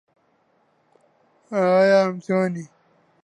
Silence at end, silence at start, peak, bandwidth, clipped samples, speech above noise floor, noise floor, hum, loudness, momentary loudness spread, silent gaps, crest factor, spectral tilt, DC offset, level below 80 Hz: 0.6 s; 1.5 s; -6 dBFS; 10 kHz; under 0.1%; 45 dB; -64 dBFS; none; -20 LUFS; 12 LU; none; 18 dB; -7 dB/octave; under 0.1%; -74 dBFS